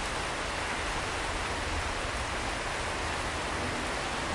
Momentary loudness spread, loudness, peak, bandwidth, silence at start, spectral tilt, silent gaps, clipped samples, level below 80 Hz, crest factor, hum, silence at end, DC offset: 1 LU; -32 LUFS; -20 dBFS; 11.5 kHz; 0 s; -3 dB/octave; none; under 0.1%; -42 dBFS; 12 dB; none; 0 s; under 0.1%